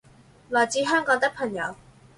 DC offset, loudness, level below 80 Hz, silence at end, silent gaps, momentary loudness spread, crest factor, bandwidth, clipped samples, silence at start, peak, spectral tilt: under 0.1%; -24 LUFS; -62 dBFS; 0.45 s; none; 9 LU; 18 dB; 11.5 kHz; under 0.1%; 0.5 s; -8 dBFS; -3 dB/octave